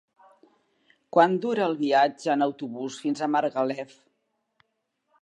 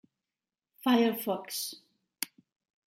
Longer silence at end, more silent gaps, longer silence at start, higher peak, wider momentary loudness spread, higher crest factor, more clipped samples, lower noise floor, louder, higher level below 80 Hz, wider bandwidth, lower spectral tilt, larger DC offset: first, 1.35 s vs 0.6 s; neither; first, 1.15 s vs 0.85 s; first, -6 dBFS vs -12 dBFS; about the same, 12 LU vs 13 LU; about the same, 22 dB vs 22 dB; neither; second, -77 dBFS vs under -90 dBFS; first, -25 LUFS vs -31 LUFS; about the same, -84 dBFS vs -86 dBFS; second, 11 kHz vs 16.5 kHz; first, -5.5 dB/octave vs -3.5 dB/octave; neither